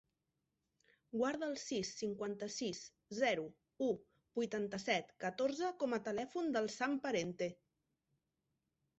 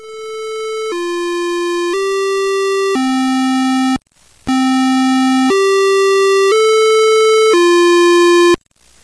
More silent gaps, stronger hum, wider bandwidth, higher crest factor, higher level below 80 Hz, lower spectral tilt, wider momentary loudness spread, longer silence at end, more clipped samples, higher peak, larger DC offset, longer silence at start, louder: neither; neither; second, 8 kHz vs 11 kHz; first, 20 dB vs 8 dB; second, -78 dBFS vs -52 dBFS; about the same, -3.5 dB/octave vs -2.5 dB/octave; second, 7 LU vs 11 LU; first, 1.45 s vs 0.5 s; neither; second, -22 dBFS vs -4 dBFS; neither; first, 1.15 s vs 0 s; second, -40 LUFS vs -12 LUFS